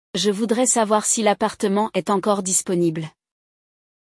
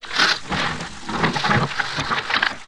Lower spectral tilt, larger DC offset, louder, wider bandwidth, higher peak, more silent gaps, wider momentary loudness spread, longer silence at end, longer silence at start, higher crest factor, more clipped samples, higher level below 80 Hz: about the same, -3.5 dB/octave vs -3.5 dB/octave; second, under 0.1% vs 1%; about the same, -20 LUFS vs -21 LUFS; about the same, 12 kHz vs 12.5 kHz; second, -6 dBFS vs 0 dBFS; neither; about the same, 5 LU vs 7 LU; first, 0.95 s vs 0 s; first, 0.15 s vs 0 s; second, 16 dB vs 22 dB; neither; second, -66 dBFS vs -46 dBFS